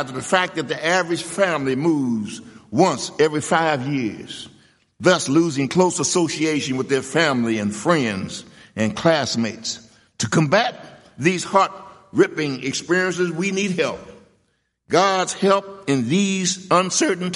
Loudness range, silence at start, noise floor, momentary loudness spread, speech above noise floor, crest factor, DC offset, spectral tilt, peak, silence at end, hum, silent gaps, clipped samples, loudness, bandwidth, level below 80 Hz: 2 LU; 0 s; -68 dBFS; 10 LU; 48 dB; 20 dB; under 0.1%; -4 dB/octave; -2 dBFS; 0 s; none; none; under 0.1%; -20 LUFS; 11.5 kHz; -62 dBFS